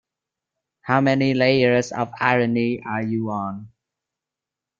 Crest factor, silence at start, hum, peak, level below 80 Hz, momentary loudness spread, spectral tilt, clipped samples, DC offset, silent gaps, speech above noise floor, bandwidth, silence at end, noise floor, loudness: 20 dB; 0.85 s; none; -2 dBFS; -62 dBFS; 11 LU; -6.5 dB/octave; under 0.1%; under 0.1%; none; 67 dB; 7.6 kHz; 1.1 s; -87 dBFS; -20 LUFS